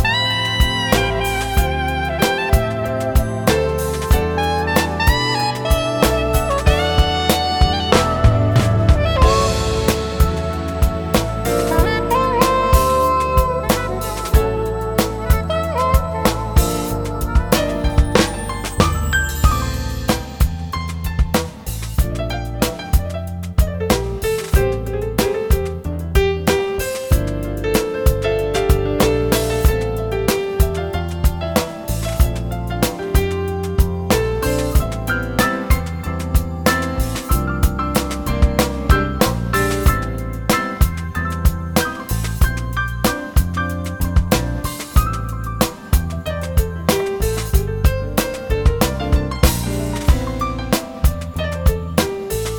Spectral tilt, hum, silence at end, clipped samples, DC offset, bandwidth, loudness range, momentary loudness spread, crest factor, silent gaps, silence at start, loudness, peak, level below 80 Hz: -5 dB/octave; none; 0 s; under 0.1%; under 0.1%; over 20 kHz; 4 LU; 7 LU; 18 dB; none; 0 s; -18 LUFS; 0 dBFS; -22 dBFS